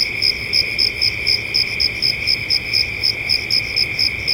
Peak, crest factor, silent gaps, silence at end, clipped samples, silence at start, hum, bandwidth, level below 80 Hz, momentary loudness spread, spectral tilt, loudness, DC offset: -4 dBFS; 16 dB; none; 0 s; under 0.1%; 0 s; none; 17 kHz; -40 dBFS; 2 LU; -1.5 dB/octave; -16 LUFS; under 0.1%